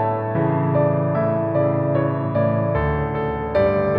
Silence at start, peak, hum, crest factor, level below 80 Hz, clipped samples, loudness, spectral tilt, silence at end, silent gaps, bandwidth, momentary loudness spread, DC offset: 0 s; -6 dBFS; none; 14 dB; -38 dBFS; under 0.1%; -20 LUFS; -11.5 dB/octave; 0 s; none; 5 kHz; 3 LU; under 0.1%